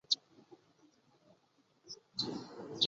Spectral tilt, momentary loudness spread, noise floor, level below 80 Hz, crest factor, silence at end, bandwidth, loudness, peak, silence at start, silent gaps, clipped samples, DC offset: -2 dB/octave; 27 LU; -73 dBFS; -82 dBFS; 26 dB; 0 s; 7.6 kHz; -40 LUFS; -16 dBFS; 0.1 s; none; under 0.1%; under 0.1%